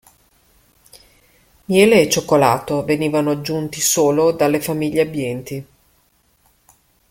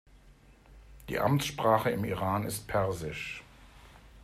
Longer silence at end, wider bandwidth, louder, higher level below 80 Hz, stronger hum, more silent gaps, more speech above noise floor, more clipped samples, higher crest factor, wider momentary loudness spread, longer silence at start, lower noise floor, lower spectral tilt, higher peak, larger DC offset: first, 1.45 s vs 0 s; about the same, 17 kHz vs 15.5 kHz; first, -17 LUFS vs -31 LUFS; about the same, -54 dBFS vs -54 dBFS; first, 60 Hz at -55 dBFS vs none; neither; first, 43 dB vs 28 dB; neither; about the same, 18 dB vs 20 dB; about the same, 12 LU vs 12 LU; first, 1.7 s vs 0.15 s; about the same, -60 dBFS vs -57 dBFS; about the same, -4.5 dB/octave vs -5.5 dB/octave; first, 0 dBFS vs -12 dBFS; neither